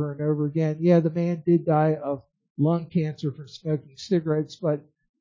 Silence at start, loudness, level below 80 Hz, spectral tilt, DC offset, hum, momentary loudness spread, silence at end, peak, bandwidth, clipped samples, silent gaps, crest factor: 0 s; -25 LUFS; -68 dBFS; -9 dB/octave; under 0.1%; none; 12 LU; 0.4 s; -8 dBFS; 7.4 kHz; under 0.1%; 2.50-2.55 s; 16 dB